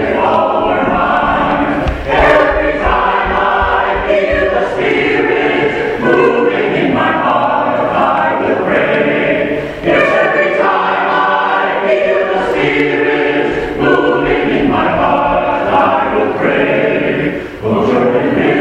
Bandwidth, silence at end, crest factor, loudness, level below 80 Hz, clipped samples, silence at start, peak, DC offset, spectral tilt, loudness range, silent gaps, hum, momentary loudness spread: 9.6 kHz; 0 s; 12 dB; -12 LUFS; -32 dBFS; under 0.1%; 0 s; 0 dBFS; under 0.1%; -6.5 dB/octave; 1 LU; none; none; 3 LU